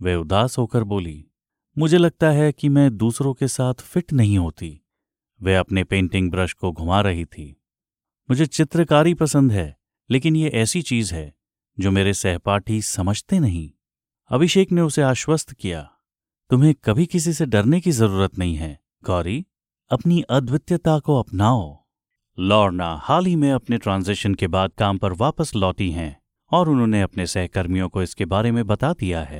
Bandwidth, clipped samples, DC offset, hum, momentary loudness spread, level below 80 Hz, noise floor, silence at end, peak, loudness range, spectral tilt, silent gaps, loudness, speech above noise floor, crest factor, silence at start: 16 kHz; under 0.1%; under 0.1%; none; 10 LU; -42 dBFS; under -90 dBFS; 0 s; -2 dBFS; 3 LU; -6 dB/octave; none; -20 LUFS; over 71 dB; 18 dB; 0 s